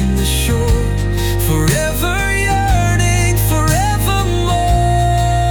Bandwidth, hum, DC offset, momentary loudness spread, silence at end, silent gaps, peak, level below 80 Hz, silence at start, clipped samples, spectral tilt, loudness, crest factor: over 20 kHz; none; under 0.1%; 3 LU; 0 s; none; -2 dBFS; -18 dBFS; 0 s; under 0.1%; -5 dB/octave; -15 LUFS; 10 dB